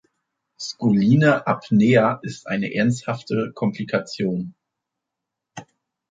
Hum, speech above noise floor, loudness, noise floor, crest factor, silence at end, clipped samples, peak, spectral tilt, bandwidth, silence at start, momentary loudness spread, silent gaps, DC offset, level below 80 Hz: none; 63 dB; -21 LUFS; -83 dBFS; 18 dB; 0.45 s; under 0.1%; -4 dBFS; -7 dB/octave; 9 kHz; 0.6 s; 17 LU; none; under 0.1%; -62 dBFS